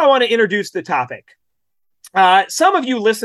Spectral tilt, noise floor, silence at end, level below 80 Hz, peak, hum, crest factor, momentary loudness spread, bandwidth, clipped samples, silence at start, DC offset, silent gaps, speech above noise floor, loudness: -3 dB/octave; -77 dBFS; 0 s; -70 dBFS; -2 dBFS; none; 14 dB; 10 LU; 12.5 kHz; under 0.1%; 0 s; under 0.1%; none; 61 dB; -15 LUFS